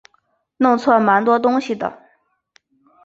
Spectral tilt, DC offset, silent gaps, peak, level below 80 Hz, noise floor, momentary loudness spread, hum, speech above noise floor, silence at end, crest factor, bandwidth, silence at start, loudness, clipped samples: -6.5 dB/octave; under 0.1%; none; -2 dBFS; -66 dBFS; -64 dBFS; 11 LU; none; 48 dB; 1.1 s; 18 dB; 7.8 kHz; 0.6 s; -17 LUFS; under 0.1%